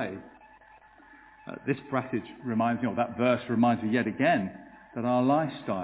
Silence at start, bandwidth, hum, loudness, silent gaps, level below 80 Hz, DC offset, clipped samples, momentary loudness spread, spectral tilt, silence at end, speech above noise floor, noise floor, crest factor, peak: 0 s; 4 kHz; none; -28 LUFS; none; -64 dBFS; under 0.1%; under 0.1%; 15 LU; -10.5 dB/octave; 0 s; 28 dB; -55 dBFS; 18 dB; -10 dBFS